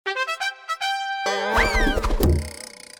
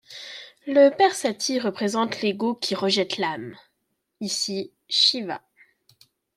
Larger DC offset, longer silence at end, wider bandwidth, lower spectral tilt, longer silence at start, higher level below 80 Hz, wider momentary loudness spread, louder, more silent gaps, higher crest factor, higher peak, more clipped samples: neither; second, 0.3 s vs 1 s; first, over 20 kHz vs 15 kHz; first, -4.5 dB/octave vs -3 dB/octave; about the same, 0.05 s vs 0.1 s; first, -28 dBFS vs -72 dBFS; second, 7 LU vs 19 LU; about the same, -23 LUFS vs -22 LUFS; neither; about the same, 16 dB vs 20 dB; about the same, -6 dBFS vs -6 dBFS; neither